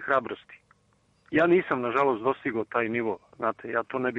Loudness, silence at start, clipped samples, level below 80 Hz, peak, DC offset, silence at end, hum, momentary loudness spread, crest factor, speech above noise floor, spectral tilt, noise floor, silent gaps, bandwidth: -27 LUFS; 0 s; under 0.1%; -66 dBFS; -10 dBFS; under 0.1%; 0 s; none; 9 LU; 18 dB; 40 dB; -8 dB/octave; -66 dBFS; none; 7 kHz